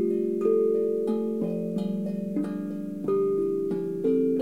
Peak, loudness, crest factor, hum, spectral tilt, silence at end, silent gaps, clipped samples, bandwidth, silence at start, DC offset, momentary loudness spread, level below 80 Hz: -12 dBFS; -27 LUFS; 14 dB; none; -9.5 dB/octave; 0 s; none; under 0.1%; 11.5 kHz; 0 s; 0.2%; 7 LU; -68 dBFS